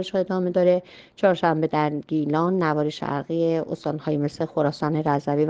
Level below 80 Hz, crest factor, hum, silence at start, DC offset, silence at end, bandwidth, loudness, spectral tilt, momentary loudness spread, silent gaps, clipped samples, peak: -62 dBFS; 16 dB; none; 0 s; under 0.1%; 0 s; 8 kHz; -23 LUFS; -8 dB/octave; 6 LU; none; under 0.1%; -6 dBFS